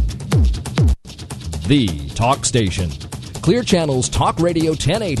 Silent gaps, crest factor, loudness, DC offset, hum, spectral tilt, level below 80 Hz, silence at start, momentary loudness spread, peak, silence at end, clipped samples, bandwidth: none; 16 dB; -18 LUFS; under 0.1%; none; -5.5 dB/octave; -26 dBFS; 0 s; 11 LU; 0 dBFS; 0 s; under 0.1%; 12.5 kHz